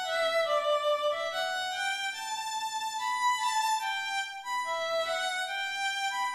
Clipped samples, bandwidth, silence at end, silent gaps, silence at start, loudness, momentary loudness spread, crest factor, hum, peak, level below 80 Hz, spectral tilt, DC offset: under 0.1%; 14 kHz; 0 s; none; 0 s; -30 LUFS; 6 LU; 14 dB; none; -16 dBFS; -74 dBFS; 1.5 dB/octave; under 0.1%